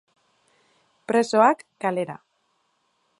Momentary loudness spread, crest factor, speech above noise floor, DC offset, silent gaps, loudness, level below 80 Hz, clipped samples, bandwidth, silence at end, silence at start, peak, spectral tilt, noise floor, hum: 20 LU; 22 dB; 49 dB; under 0.1%; none; -22 LUFS; -80 dBFS; under 0.1%; 11.5 kHz; 1.05 s; 1.1 s; -4 dBFS; -5 dB/octave; -70 dBFS; none